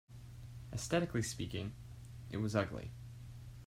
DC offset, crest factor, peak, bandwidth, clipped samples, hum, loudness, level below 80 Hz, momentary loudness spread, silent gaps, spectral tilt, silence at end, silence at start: under 0.1%; 22 dB; -20 dBFS; 16 kHz; under 0.1%; none; -39 LUFS; -58 dBFS; 16 LU; none; -5.5 dB/octave; 0 s; 0.1 s